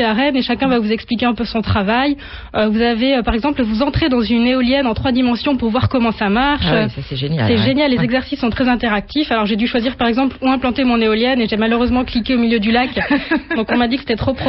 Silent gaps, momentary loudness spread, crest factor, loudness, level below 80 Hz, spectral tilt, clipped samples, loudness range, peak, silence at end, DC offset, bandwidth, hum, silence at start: none; 4 LU; 12 dB; -16 LUFS; -34 dBFS; -9 dB/octave; under 0.1%; 1 LU; -4 dBFS; 0 s; under 0.1%; 5.8 kHz; none; 0 s